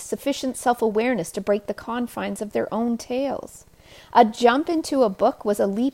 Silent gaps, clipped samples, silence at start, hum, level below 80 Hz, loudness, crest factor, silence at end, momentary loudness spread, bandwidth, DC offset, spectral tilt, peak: none; under 0.1%; 0 s; none; -58 dBFS; -23 LUFS; 20 dB; 0 s; 10 LU; 16.5 kHz; under 0.1%; -4.5 dB/octave; -2 dBFS